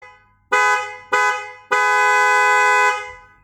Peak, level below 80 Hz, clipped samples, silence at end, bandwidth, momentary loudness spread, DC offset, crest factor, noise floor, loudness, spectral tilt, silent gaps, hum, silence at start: -2 dBFS; -62 dBFS; under 0.1%; 0.25 s; 19.5 kHz; 9 LU; under 0.1%; 16 dB; -46 dBFS; -16 LUFS; 0.5 dB/octave; none; none; 0 s